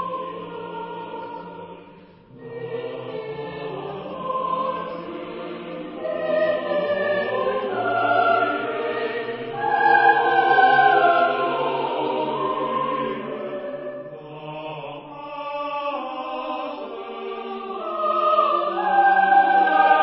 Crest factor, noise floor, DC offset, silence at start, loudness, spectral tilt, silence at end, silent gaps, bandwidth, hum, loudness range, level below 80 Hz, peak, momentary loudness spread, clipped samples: 20 dB; -47 dBFS; under 0.1%; 0 s; -22 LUFS; -9 dB/octave; 0 s; none; 5.8 kHz; none; 13 LU; -66 dBFS; -4 dBFS; 18 LU; under 0.1%